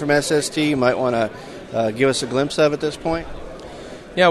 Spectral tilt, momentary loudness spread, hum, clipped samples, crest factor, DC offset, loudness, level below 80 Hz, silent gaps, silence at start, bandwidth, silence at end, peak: -4.5 dB/octave; 18 LU; none; under 0.1%; 18 dB; under 0.1%; -20 LUFS; -44 dBFS; none; 0 s; 12.5 kHz; 0 s; -2 dBFS